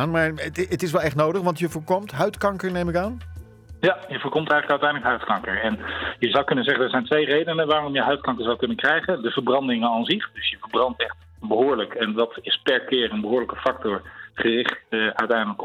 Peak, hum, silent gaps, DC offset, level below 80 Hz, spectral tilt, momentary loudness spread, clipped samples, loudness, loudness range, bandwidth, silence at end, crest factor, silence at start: -8 dBFS; none; none; under 0.1%; -52 dBFS; -5.5 dB/octave; 7 LU; under 0.1%; -23 LUFS; 3 LU; 17 kHz; 0 s; 16 dB; 0 s